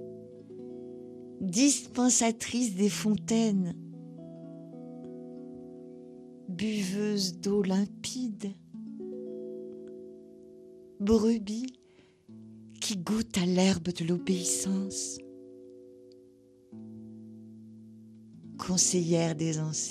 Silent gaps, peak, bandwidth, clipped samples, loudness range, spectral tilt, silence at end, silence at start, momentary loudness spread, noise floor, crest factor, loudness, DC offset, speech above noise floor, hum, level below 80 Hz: none; -12 dBFS; 13.5 kHz; under 0.1%; 11 LU; -4.5 dB/octave; 0 s; 0 s; 24 LU; -61 dBFS; 20 dB; -29 LUFS; under 0.1%; 32 dB; none; -62 dBFS